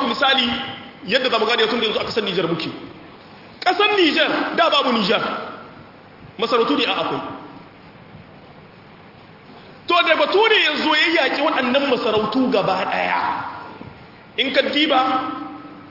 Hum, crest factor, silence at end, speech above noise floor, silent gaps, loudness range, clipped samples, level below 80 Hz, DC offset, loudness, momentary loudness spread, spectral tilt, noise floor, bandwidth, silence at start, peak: none; 18 dB; 0 s; 25 dB; none; 7 LU; under 0.1%; -60 dBFS; under 0.1%; -18 LUFS; 18 LU; -4.5 dB/octave; -44 dBFS; 5.8 kHz; 0 s; -2 dBFS